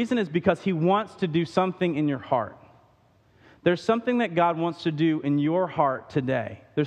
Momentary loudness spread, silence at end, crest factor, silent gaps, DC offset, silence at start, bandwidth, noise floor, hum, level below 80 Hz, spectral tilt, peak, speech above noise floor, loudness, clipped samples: 4 LU; 0 s; 20 dB; none; under 0.1%; 0 s; 9.4 kHz; -61 dBFS; none; -64 dBFS; -7.5 dB/octave; -6 dBFS; 36 dB; -25 LUFS; under 0.1%